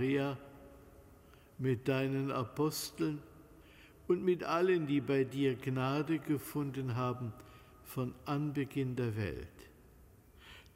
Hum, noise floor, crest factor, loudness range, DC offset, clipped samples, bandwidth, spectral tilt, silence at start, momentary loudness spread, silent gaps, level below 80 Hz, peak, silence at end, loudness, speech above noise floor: none; -60 dBFS; 18 dB; 5 LU; under 0.1%; under 0.1%; 16 kHz; -6.5 dB/octave; 0 s; 15 LU; none; -62 dBFS; -20 dBFS; 0.15 s; -36 LUFS; 26 dB